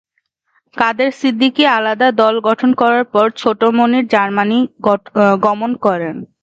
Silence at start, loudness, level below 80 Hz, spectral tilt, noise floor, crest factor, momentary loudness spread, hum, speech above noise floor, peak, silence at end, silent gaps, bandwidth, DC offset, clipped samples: 0.75 s; -14 LUFS; -62 dBFS; -6 dB/octave; -67 dBFS; 14 dB; 5 LU; none; 53 dB; 0 dBFS; 0.2 s; none; 7.8 kHz; under 0.1%; under 0.1%